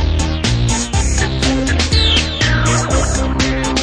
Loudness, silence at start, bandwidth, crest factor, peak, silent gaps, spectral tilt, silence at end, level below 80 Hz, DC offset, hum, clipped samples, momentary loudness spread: -15 LUFS; 0 s; 11 kHz; 12 dB; -2 dBFS; none; -4 dB/octave; 0 s; -20 dBFS; under 0.1%; none; under 0.1%; 4 LU